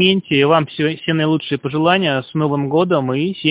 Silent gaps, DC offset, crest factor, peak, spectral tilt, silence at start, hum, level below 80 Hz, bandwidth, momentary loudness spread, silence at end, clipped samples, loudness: none; under 0.1%; 16 dB; 0 dBFS; -10.5 dB/octave; 0 s; none; -54 dBFS; 4 kHz; 6 LU; 0 s; under 0.1%; -17 LUFS